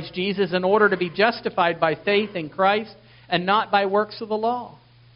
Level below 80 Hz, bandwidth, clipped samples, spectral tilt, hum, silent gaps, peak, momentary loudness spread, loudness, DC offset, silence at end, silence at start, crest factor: -62 dBFS; 5.6 kHz; under 0.1%; -2.5 dB/octave; none; none; -4 dBFS; 8 LU; -22 LUFS; under 0.1%; 0.45 s; 0 s; 20 dB